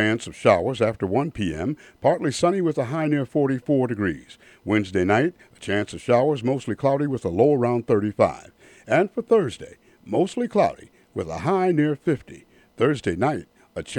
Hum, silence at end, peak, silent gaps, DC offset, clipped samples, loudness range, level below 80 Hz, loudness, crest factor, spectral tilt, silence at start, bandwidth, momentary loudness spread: none; 0 s; -4 dBFS; none; under 0.1%; under 0.1%; 2 LU; -54 dBFS; -23 LUFS; 20 dB; -6.5 dB/octave; 0 s; 11.5 kHz; 10 LU